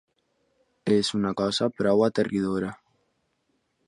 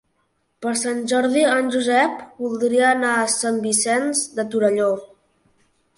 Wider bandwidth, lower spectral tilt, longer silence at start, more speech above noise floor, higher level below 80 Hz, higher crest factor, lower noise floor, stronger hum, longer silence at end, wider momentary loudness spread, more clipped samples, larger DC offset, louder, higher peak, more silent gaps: about the same, 11 kHz vs 11.5 kHz; first, -5.5 dB/octave vs -2.5 dB/octave; first, 0.85 s vs 0.6 s; about the same, 49 dB vs 49 dB; first, -60 dBFS vs -68 dBFS; about the same, 18 dB vs 16 dB; first, -73 dBFS vs -68 dBFS; neither; first, 1.15 s vs 0.9 s; about the same, 8 LU vs 7 LU; neither; neither; second, -25 LUFS vs -20 LUFS; second, -8 dBFS vs -4 dBFS; neither